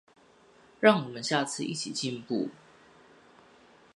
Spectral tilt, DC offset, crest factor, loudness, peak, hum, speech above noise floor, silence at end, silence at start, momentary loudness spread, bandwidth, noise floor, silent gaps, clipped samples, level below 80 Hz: -4 dB/octave; under 0.1%; 28 dB; -29 LUFS; -4 dBFS; none; 31 dB; 1.4 s; 0.8 s; 10 LU; 11.5 kHz; -59 dBFS; none; under 0.1%; -76 dBFS